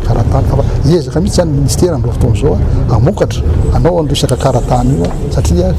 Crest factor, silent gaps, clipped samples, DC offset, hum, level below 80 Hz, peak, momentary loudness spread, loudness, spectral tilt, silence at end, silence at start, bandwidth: 8 dB; none; under 0.1%; under 0.1%; none; -16 dBFS; -2 dBFS; 2 LU; -12 LUFS; -6.5 dB/octave; 0 s; 0 s; 14.5 kHz